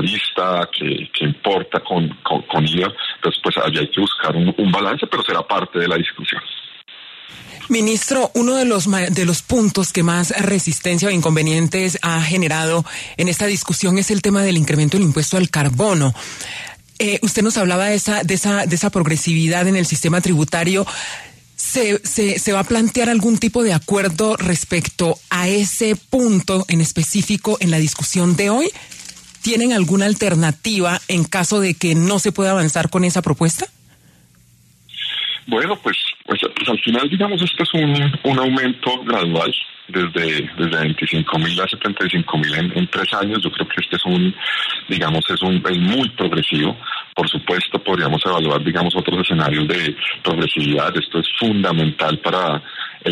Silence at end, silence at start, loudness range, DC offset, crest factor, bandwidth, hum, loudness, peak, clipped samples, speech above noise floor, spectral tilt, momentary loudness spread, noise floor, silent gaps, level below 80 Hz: 0 s; 0 s; 3 LU; under 0.1%; 14 dB; 13.5 kHz; none; -17 LUFS; -2 dBFS; under 0.1%; 34 dB; -4.5 dB/octave; 5 LU; -51 dBFS; none; -48 dBFS